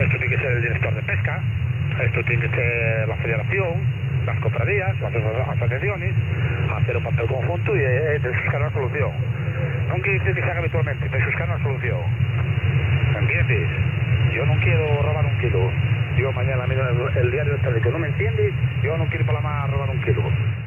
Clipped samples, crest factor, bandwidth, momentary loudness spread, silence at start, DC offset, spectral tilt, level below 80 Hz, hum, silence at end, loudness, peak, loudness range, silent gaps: under 0.1%; 14 dB; 3.3 kHz; 4 LU; 0 s; under 0.1%; -9 dB/octave; -38 dBFS; none; 0 s; -21 LUFS; -6 dBFS; 2 LU; none